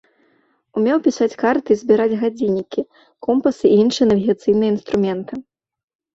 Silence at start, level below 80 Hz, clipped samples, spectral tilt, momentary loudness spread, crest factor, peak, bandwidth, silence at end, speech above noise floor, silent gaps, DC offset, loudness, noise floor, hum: 0.75 s; -56 dBFS; under 0.1%; -6.5 dB/octave; 12 LU; 16 dB; -2 dBFS; 7.8 kHz; 0.75 s; 44 dB; none; under 0.1%; -18 LUFS; -61 dBFS; none